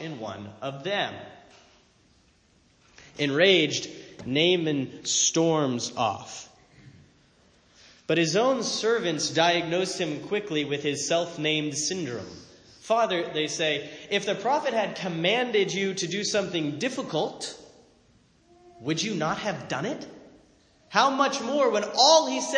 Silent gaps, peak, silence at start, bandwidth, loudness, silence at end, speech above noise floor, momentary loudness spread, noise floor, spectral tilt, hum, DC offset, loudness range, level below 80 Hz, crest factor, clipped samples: none; -6 dBFS; 0 s; 10.5 kHz; -25 LUFS; 0 s; 36 dB; 15 LU; -62 dBFS; -3 dB/octave; none; under 0.1%; 7 LU; -68 dBFS; 22 dB; under 0.1%